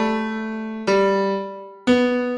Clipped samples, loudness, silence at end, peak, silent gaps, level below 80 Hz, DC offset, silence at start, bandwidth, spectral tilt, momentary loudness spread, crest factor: under 0.1%; -21 LUFS; 0 s; -6 dBFS; none; -54 dBFS; under 0.1%; 0 s; 10.5 kHz; -6 dB/octave; 10 LU; 14 dB